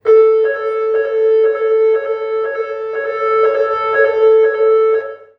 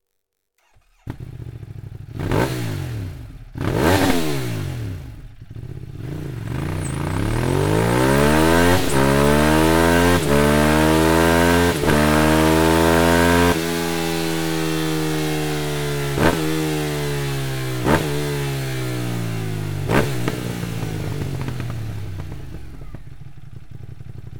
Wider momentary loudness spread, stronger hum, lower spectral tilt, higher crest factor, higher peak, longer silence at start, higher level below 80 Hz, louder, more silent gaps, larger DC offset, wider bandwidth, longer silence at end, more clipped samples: second, 9 LU vs 20 LU; neither; about the same, -4.5 dB/octave vs -5.5 dB/octave; second, 12 dB vs 20 dB; about the same, -2 dBFS vs 0 dBFS; second, 0.05 s vs 1.05 s; second, -66 dBFS vs -34 dBFS; first, -14 LUFS vs -19 LUFS; neither; neither; second, 5.2 kHz vs 19 kHz; first, 0.25 s vs 0 s; neither